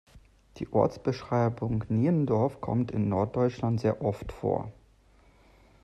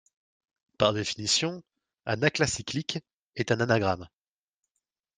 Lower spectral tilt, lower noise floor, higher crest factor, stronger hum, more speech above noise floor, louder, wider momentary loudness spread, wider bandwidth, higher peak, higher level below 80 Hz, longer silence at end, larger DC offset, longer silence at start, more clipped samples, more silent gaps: first, -9 dB/octave vs -3.5 dB/octave; second, -60 dBFS vs -87 dBFS; second, 18 dB vs 24 dB; neither; second, 32 dB vs 59 dB; about the same, -29 LUFS vs -28 LUFS; second, 7 LU vs 12 LU; second, 8 kHz vs 10 kHz; second, -10 dBFS vs -6 dBFS; first, -54 dBFS vs -60 dBFS; about the same, 1.1 s vs 1.1 s; neither; second, 0.15 s vs 0.8 s; neither; second, none vs 3.14-3.28 s